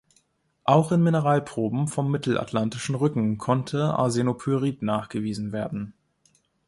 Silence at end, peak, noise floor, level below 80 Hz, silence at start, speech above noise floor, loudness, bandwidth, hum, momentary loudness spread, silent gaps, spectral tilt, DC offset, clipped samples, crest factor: 0.75 s; -4 dBFS; -67 dBFS; -60 dBFS; 0.65 s; 43 dB; -25 LUFS; 11.5 kHz; none; 9 LU; none; -7 dB/octave; under 0.1%; under 0.1%; 20 dB